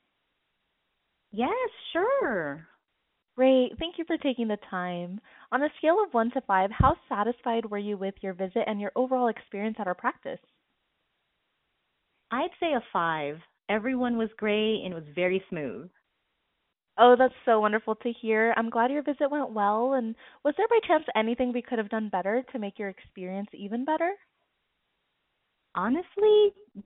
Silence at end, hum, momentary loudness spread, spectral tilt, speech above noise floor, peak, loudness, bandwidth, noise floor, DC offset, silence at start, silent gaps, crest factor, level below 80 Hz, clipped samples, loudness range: 0.05 s; none; 14 LU; -4 dB/octave; 52 dB; -6 dBFS; -27 LUFS; 4 kHz; -79 dBFS; under 0.1%; 1.35 s; none; 22 dB; -52 dBFS; under 0.1%; 8 LU